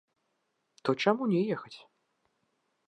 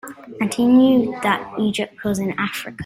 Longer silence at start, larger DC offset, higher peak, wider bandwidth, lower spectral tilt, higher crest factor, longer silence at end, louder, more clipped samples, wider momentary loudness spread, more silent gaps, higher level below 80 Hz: first, 0.85 s vs 0.05 s; neither; second, -10 dBFS vs -4 dBFS; second, 9.8 kHz vs 16 kHz; about the same, -6.5 dB/octave vs -5.5 dB/octave; first, 24 dB vs 16 dB; first, 1.1 s vs 0 s; second, -30 LUFS vs -19 LUFS; neither; first, 19 LU vs 11 LU; neither; second, -84 dBFS vs -56 dBFS